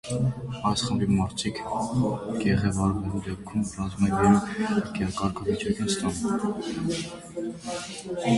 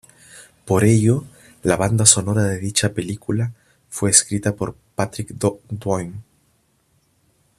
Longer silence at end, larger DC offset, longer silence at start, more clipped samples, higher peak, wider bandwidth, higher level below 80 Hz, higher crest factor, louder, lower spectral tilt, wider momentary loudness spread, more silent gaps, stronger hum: second, 0 s vs 1.35 s; neither; second, 0.05 s vs 0.35 s; neither; second, -8 dBFS vs 0 dBFS; second, 11.5 kHz vs 14.5 kHz; about the same, -46 dBFS vs -50 dBFS; about the same, 18 dB vs 20 dB; second, -27 LUFS vs -19 LUFS; first, -5.5 dB/octave vs -4 dB/octave; second, 10 LU vs 14 LU; neither; neither